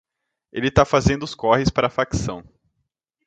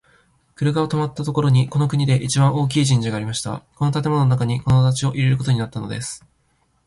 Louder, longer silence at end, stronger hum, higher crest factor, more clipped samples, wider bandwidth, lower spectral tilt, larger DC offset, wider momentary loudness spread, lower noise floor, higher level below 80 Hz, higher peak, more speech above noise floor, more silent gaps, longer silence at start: about the same, -20 LUFS vs -20 LUFS; first, 0.85 s vs 0.7 s; neither; first, 22 dB vs 16 dB; neither; second, 9.2 kHz vs 11.5 kHz; about the same, -5.5 dB/octave vs -6 dB/octave; neither; first, 13 LU vs 10 LU; first, -76 dBFS vs -64 dBFS; first, -38 dBFS vs -48 dBFS; first, 0 dBFS vs -4 dBFS; first, 56 dB vs 45 dB; neither; about the same, 0.55 s vs 0.6 s